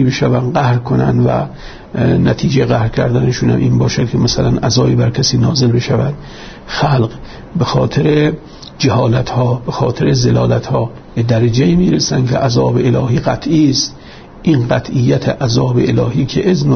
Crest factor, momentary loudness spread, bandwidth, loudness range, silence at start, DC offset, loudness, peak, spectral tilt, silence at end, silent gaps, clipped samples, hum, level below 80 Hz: 12 dB; 8 LU; 6.6 kHz; 2 LU; 0 s; under 0.1%; -13 LUFS; 0 dBFS; -6 dB/octave; 0 s; none; under 0.1%; none; -34 dBFS